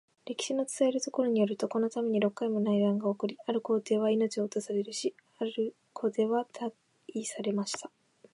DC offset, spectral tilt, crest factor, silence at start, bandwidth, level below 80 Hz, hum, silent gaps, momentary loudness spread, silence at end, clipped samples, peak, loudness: under 0.1%; -5 dB/octave; 16 dB; 0.25 s; 11.5 kHz; -84 dBFS; none; none; 10 LU; 0.45 s; under 0.1%; -16 dBFS; -31 LUFS